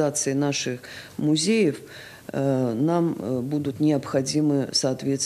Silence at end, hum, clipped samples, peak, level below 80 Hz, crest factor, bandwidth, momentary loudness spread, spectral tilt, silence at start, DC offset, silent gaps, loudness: 0 s; none; under 0.1%; -10 dBFS; -64 dBFS; 14 dB; 14.5 kHz; 12 LU; -5 dB/octave; 0 s; under 0.1%; none; -24 LUFS